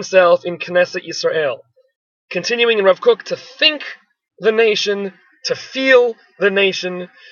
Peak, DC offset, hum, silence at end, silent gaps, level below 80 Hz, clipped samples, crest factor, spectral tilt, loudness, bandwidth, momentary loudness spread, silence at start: 0 dBFS; under 0.1%; none; 0.25 s; 1.96-2.28 s; -72 dBFS; under 0.1%; 16 dB; -3.5 dB/octave; -16 LUFS; 7.2 kHz; 14 LU; 0 s